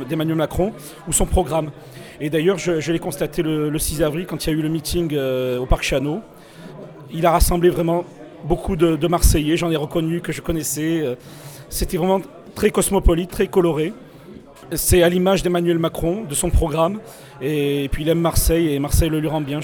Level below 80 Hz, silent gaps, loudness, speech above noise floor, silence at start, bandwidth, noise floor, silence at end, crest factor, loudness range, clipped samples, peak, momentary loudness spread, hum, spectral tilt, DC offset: -28 dBFS; none; -20 LUFS; 22 dB; 0 s; over 20 kHz; -41 dBFS; 0 s; 18 dB; 3 LU; under 0.1%; -2 dBFS; 14 LU; none; -5 dB/octave; under 0.1%